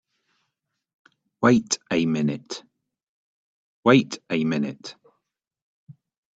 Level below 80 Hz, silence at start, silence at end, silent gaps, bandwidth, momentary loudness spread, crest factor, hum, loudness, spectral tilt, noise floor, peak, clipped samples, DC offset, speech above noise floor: -66 dBFS; 1.4 s; 0.45 s; 3.03-3.83 s, 5.62-5.87 s; 8.2 kHz; 19 LU; 22 dB; none; -22 LUFS; -5 dB/octave; -81 dBFS; -4 dBFS; under 0.1%; under 0.1%; 59 dB